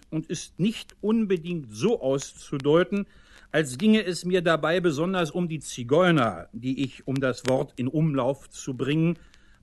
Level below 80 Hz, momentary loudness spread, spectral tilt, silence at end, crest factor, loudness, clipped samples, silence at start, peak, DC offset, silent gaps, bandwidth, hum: -58 dBFS; 10 LU; -6 dB/octave; 0.45 s; 18 dB; -26 LUFS; under 0.1%; 0.1 s; -8 dBFS; under 0.1%; none; 12.5 kHz; none